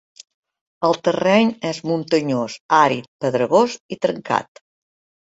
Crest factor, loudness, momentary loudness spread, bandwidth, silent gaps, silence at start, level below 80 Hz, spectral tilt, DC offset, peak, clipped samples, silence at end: 18 dB; -19 LUFS; 8 LU; 8 kHz; 2.60-2.69 s, 3.08-3.19 s, 3.80-3.89 s; 0.8 s; -64 dBFS; -5.5 dB/octave; under 0.1%; -2 dBFS; under 0.1%; 0.85 s